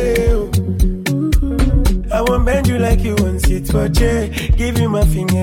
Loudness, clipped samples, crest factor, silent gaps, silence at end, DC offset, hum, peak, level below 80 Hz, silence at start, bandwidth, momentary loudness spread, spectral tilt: -16 LUFS; under 0.1%; 12 dB; none; 0 s; under 0.1%; none; 0 dBFS; -18 dBFS; 0 s; 17 kHz; 3 LU; -6.5 dB/octave